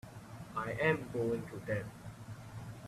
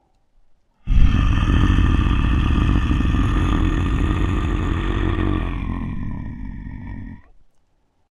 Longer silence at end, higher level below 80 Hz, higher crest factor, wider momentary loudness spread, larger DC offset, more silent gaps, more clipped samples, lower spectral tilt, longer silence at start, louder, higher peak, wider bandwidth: second, 0 s vs 0.9 s; second, -62 dBFS vs -22 dBFS; about the same, 22 dB vs 18 dB; about the same, 17 LU vs 16 LU; neither; neither; neither; about the same, -6.5 dB/octave vs -7.5 dB/octave; second, 0.05 s vs 0.85 s; second, -37 LUFS vs -21 LUFS; second, -16 dBFS vs -2 dBFS; first, 14.5 kHz vs 7.2 kHz